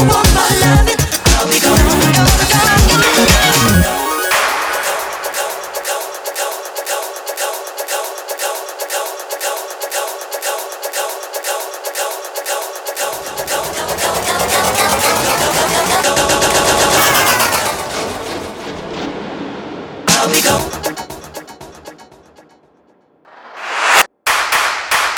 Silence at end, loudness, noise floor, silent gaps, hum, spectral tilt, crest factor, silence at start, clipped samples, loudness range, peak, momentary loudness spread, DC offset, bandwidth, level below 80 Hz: 0 s; -14 LUFS; -53 dBFS; none; none; -3 dB/octave; 16 dB; 0 s; under 0.1%; 11 LU; 0 dBFS; 14 LU; under 0.1%; over 20 kHz; -26 dBFS